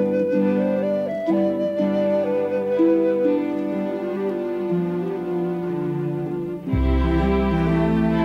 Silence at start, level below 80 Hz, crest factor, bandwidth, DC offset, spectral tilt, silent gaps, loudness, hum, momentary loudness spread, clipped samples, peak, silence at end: 0 s; -32 dBFS; 12 dB; 6.8 kHz; under 0.1%; -9.5 dB/octave; none; -22 LUFS; none; 6 LU; under 0.1%; -8 dBFS; 0 s